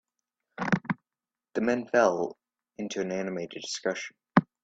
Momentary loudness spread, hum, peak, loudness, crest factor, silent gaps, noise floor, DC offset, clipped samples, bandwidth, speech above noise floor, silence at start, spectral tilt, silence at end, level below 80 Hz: 13 LU; none; -4 dBFS; -30 LUFS; 26 dB; none; under -90 dBFS; under 0.1%; under 0.1%; 8.4 kHz; over 61 dB; 0.6 s; -5.5 dB/octave; 0.2 s; -66 dBFS